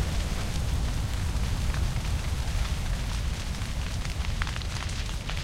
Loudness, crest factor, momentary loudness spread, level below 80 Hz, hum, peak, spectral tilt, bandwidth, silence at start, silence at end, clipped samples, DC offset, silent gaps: -31 LUFS; 18 dB; 3 LU; -30 dBFS; none; -12 dBFS; -4.5 dB/octave; 16 kHz; 0 s; 0 s; under 0.1%; under 0.1%; none